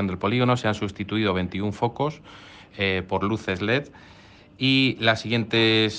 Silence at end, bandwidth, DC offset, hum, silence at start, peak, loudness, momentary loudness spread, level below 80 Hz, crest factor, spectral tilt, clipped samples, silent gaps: 0 s; 9.2 kHz; under 0.1%; none; 0 s; -4 dBFS; -23 LUFS; 10 LU; -56 dBFS; 20 dB; -6 dB/octave; under 0.1%; none